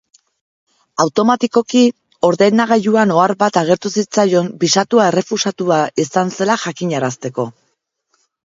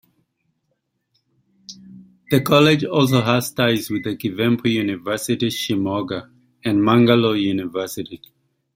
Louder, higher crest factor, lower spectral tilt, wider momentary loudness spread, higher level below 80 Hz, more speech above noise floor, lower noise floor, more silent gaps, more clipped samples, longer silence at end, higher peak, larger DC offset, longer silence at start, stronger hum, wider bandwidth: first, -15 LUFS vs -19 LUFS; about the same, 16 dB vs 18 dB; about the same, -4.5 dB/octave vs -5.5 dB/octave; second, 7 LU vs 16 LU; about the same, -62 dBFS vs -58 dBFS; about the same, 53 dB vs 54 dB; second, -68 dBFS vs -72 dBFS; neither; neither; first, 0.95 s vs 0.6 s; about the same, 0 dBFS vs -2 dBFS; neither; second, 1 s vs 1.7 s; neither; second, 7.8 kHz vs 16.5 kHz